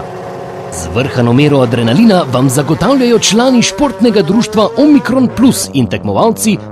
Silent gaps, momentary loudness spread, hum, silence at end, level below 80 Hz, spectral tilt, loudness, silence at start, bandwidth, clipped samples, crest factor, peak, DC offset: none; 9 LU; none; 0 s; -40 dBFS; -5 dB/octave; -10 LUFS; 0 s; 14.5 kHz; 0.5%; 10 dB; 0 dBFS; under 0.1%